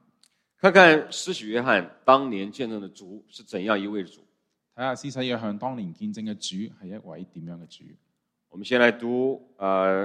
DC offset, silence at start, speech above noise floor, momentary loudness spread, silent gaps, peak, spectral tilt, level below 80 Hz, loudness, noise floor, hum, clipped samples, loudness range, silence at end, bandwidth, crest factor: under 0.1%; 0.65 s; 42 dB; 22 LU; none; 0 dBFS; -4.5 dB/octave; -72 dBFS; -23 LUFS; -66 dBFS; none; under 0.1%; 12 LU; 0 s; 12 kHz; 24 dB